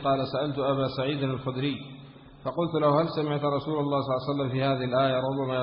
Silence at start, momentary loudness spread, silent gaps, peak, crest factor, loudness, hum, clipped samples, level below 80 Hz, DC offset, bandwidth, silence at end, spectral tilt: 0 s; 7 LU; none; -12 dBFS; 16 dB; -27 LUFS; none; under 0.1%; -58 dBFS; under 0.1%; 5.4 kHz; 0 s; -11 dB/octave